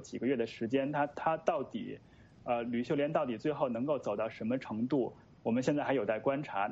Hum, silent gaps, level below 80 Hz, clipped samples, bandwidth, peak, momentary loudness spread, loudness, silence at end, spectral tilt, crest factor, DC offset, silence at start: none; none; -70 dBFS; under 0.1%; 8 kHz; -14 dBFS; 8 LU; -34 LUFS; 0 s; -7 dB/octave; 20 dB; under 0.1%; 0 s